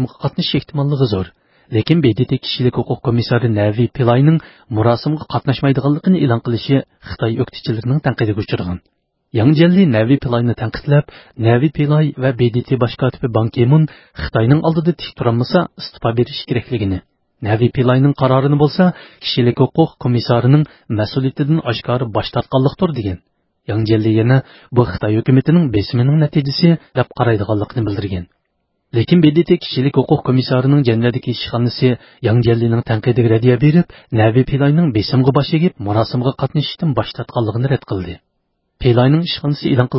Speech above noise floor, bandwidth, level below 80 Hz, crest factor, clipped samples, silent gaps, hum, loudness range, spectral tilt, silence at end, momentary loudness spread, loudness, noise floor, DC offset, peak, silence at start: 54 dB; 5.8 kHz; -40 dBFS; 14 dB; under 0.1%; none; none; 3 LU; -11.5 dB/octave; 0 s; 8 LU; -15 LUFS; -69 dBFS; under 0.1%; 0 dBFS; 0 s